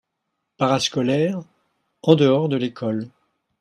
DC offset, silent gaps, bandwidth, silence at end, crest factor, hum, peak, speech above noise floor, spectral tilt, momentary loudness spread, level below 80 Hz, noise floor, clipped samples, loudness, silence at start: under 0.1%; none; 13 kHz; 0.5 s; 22 dB; none; 0 dBFS; 58 dB; -6 dB/octave; 12 LU; -64 dBFS; -78 dBFS; under 0.1%; -20 LUFS; 0.6 s